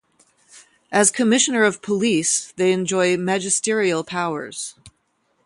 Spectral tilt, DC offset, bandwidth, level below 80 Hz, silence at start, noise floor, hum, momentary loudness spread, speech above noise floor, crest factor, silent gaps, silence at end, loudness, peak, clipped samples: -3 dB/octave; under 0.1%; 11.5 kHz; -66 dBFS; 0.55 s; -67 dBFS; none; 9 LU; 48 dB; 18 dB; none; 0.55 s; -19 LUFS; -4 dBFS; under 0.1%